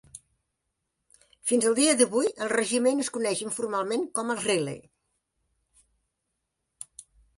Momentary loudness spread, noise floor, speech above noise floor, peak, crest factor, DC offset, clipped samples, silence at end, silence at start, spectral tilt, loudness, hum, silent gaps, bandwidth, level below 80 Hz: 22 LU; -81 dBFS; 56 dB; -8 dBFS; 22 dB; under 0.1%; under 0.1%; 2.6 s; 0.15 s; -2.5 dB/octave; -26 LUFS; none; none; 11.5 kHz; -70 dBFS